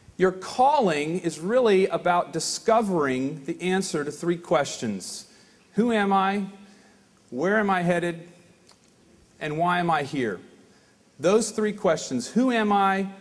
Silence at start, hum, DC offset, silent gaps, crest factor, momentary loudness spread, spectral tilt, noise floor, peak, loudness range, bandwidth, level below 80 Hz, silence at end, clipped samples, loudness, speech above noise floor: 0.2 s; none; under 0.1%; none; 18 dB; 10 LU; -5 dB/octave; -58 dBFS; -8 dBFS; 5 LU; 11 kHz; -64 dBFS; 0 s; under 0.1%; -24 LUFS; 34 dB